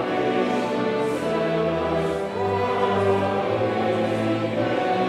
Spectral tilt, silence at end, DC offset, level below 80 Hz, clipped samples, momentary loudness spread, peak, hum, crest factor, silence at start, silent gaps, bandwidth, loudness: -6.5 dB/octave; 0 s; under 0.1%; -56 dBFS; under 0.1%; 3 LU; -8 dBFS; none; 14 dB; 0 s; none; 13 kHz; -23 LUFS